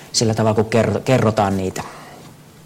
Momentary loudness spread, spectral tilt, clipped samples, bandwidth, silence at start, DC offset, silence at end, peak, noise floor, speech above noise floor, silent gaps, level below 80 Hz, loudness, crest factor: 14 LU; -5 dB/octave; under 0.1%; 16.5 kHz; 0 s; under 0.1%; 0.35 s; -6 dBFS; -42 dBFS; 24 dB; none; -50 dBFS; -18 LUFS; 14 dB